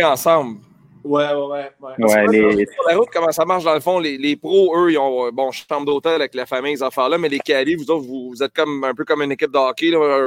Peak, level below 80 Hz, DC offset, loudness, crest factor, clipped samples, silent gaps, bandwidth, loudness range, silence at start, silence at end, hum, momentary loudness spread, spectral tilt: -2 dBFS; -60 dBFS; under 0.1%; -18 LUFS; 16 dB; under 0.1%; none; 17 kHz; 4 LU; 0 s; 0 s; none; 8 LU; -4.5 dB/octave